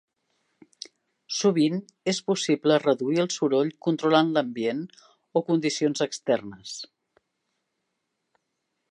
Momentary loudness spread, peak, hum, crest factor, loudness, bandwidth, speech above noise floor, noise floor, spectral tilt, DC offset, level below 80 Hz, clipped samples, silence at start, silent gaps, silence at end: 17 LU; -6 dBFS; none; 20 dB; -25 LUFS; 10.5 kHz; 55 dB; -79 dBFS; -5 dB/octave; under 0.1%; -78 dBFS; under 0.1%; 1.3 s; none; 2.05 s